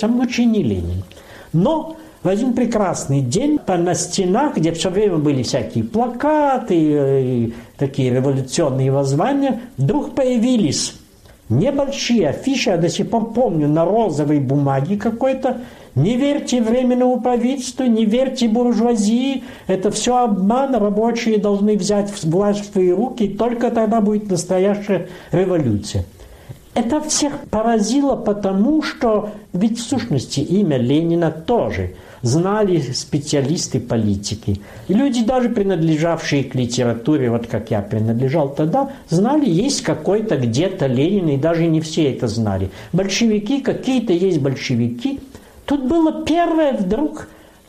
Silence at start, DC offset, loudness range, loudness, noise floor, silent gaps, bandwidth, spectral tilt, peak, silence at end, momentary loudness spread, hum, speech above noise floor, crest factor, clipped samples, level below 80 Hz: 0 s; under 0.1%; 2 LU; -18 LUFS; -38 dBFS; none; 14.5 kHz; -6 dB/octave; -6 dBFS; 0.4 s; 6 LU; none; 21 dB; 12 dB; under 0.1%; -44 dBFS